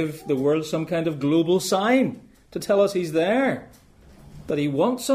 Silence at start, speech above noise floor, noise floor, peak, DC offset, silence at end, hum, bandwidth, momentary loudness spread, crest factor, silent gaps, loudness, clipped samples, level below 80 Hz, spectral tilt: 0 s; 27 dB; -49 dBFS; -8 dBFS; under 0.1%; 0 s; none; 15.5 kHz; 9 LU; 14 dB; none; -22 LUFS; under 0.1%; -56 dBFS; -5.5 dB/octave